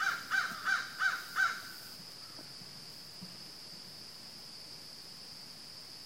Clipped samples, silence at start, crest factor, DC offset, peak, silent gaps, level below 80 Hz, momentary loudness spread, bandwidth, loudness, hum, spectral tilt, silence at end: under 0.1%; 0 s; 22 dB; under 0.1%; -18 dBFS; none; -78 dBFS; 14 LU; 16 kHz; -38 LUFS; none; -0.5 dB/octave; 0 s